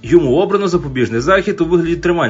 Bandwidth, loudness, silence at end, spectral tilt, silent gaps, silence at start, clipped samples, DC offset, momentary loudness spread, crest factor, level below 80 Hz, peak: 7.8 kHz; -14 LUFS; 0 s; -6.5 dB/octave; none; 0.05 s; under 0.1%; under 0.1%; 5 LU; 14 dB; -36 dBFS; 0 dBFS